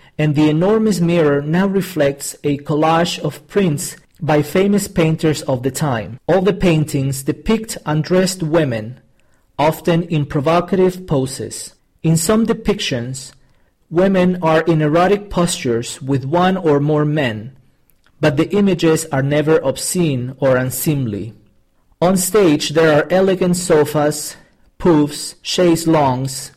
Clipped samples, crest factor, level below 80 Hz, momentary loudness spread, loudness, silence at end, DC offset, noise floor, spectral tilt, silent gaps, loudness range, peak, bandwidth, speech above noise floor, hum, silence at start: under 0.1%; 12 dB; -42 dBFS; 9 LU; -16 LUFS; 0.1 s; under 0.1%; -55 dBFS; -5.5 dB/octave; none; 3 LU; -4 dBFS; 16 kHz; 40 dB; none; 0.2 s